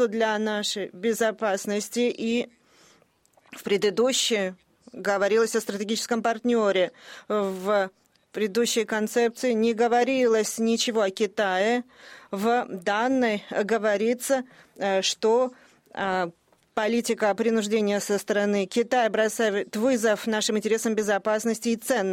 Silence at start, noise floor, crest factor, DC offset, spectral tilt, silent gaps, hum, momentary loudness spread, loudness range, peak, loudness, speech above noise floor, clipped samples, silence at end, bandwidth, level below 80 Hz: 0 s; -62 dBFS; 14 dB; under 0.1%; -3.5 dB/octave; none; none; 7 LU; 3 LU; -12 dBFS; -25 LUFS; 38 dB; under 0.1%; 0 s; 16.5 kHz; -70 dBFS